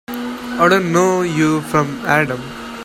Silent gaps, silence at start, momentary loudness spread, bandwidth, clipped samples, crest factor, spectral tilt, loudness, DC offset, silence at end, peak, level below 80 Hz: none; 0.1 s; 12 LU; 16.5 kHz; under 0.1%; 16 dB; -5.5 dB/octave; -16 LUFS; under 0.1%; 0 s; 0 dBFS; -48 dBFS